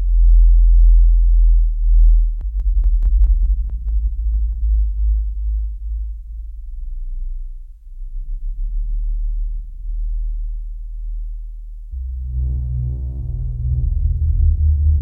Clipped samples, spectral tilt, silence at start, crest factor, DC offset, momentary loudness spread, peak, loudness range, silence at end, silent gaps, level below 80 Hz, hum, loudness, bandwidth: under 0.1%; -12 dB/octave; 0 s; 12 dB; under 0.1%; 18 LU; -4 dBFS; 12 LU; 0 s; none; -16 dBFS; none; -20 LUFS; 0.4 kHz